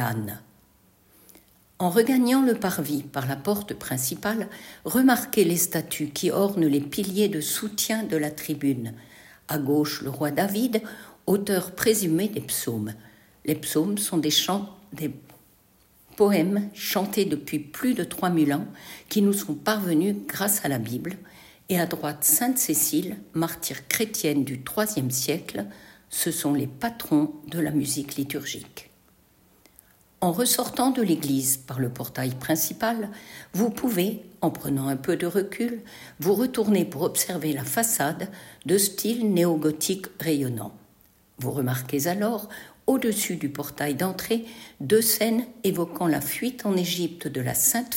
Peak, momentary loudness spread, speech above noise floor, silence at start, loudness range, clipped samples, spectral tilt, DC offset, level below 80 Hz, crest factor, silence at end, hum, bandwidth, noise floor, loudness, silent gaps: -2 dBFS; 12 LU; 35 dB; 0 s; 3 LU; under 0.1%; -4 dB/octave; under 0.1%; -62 dBFS; 24 dB; 0 s; none; 16.5 kHz; -60 dBFS; -25 LUFS; none